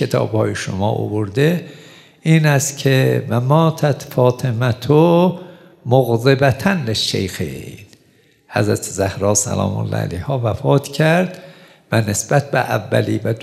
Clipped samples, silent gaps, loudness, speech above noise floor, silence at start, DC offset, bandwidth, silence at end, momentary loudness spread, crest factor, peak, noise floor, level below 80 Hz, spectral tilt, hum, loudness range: under 0.1%; none; -17 LUFS; 38 dB; 0 s; under 0.1%; 14.5 kHz; 0 s; 10 LU; 16 dB; 0 dBFS; -54 dBFS; -54 dBFS; -5.5 dB/octave; none; 4 LU